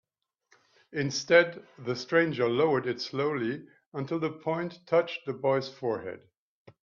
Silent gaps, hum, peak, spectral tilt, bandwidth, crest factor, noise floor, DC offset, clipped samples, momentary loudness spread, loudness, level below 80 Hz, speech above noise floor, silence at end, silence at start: 3.86-3.92 s; none; -6 dBFS; -5 dB/octave; 7.2 kHz; 24 dB; -71 dBFS; under 0.1%; under 0.1%; 16 LU; -29 LUFS; -74 dBFS; 42 dB; 0.65 s; 0.9 s